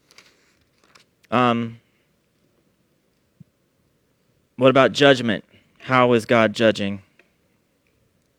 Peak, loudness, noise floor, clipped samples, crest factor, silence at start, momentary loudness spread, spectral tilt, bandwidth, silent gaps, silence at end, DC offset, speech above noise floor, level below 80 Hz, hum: 0 dBFS; -18 LUFS; -66 dBFS; under 0.1%; 22 dB; 1.3 s; 14 LU; -5.5 dB/octave; 13 kHz; none; 1.4 s; under 0.1%; 48 dB; -64 dBFS; none